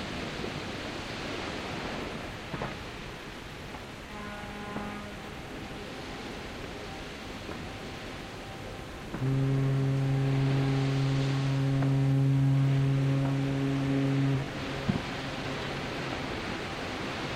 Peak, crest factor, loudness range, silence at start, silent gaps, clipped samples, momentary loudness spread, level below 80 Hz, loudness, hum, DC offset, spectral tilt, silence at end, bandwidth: -14 dBFS; 16 dB; 12 LU; 0 s; none; under 0.1%; 14 LU; -50 dBFS; -32 LUFS; none; under 0.1%; -6.5 dB/octave; 0 s; 11 kHz